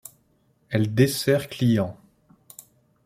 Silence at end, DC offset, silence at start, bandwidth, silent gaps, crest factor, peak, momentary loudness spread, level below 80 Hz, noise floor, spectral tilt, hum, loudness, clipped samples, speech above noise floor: 1.15 s; under 0.1%; 0.7 s; 16 kHz; none; 20 dB; -4 dBFS; 17 LU; -58 dBFS; -64 dBFS; -6 dB/octave; none; -23 LUFS; under 0.1%; 43 dB